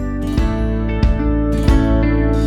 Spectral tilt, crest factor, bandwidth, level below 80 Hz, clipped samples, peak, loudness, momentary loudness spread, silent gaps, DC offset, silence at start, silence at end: -8 dB/octave; 12 dB; 10.5 kHz; -18 dBFS; under 0.1%; -2 dBFS; -17 LUFS; 5 LU; none; under 0.1%; 0 s; 0 s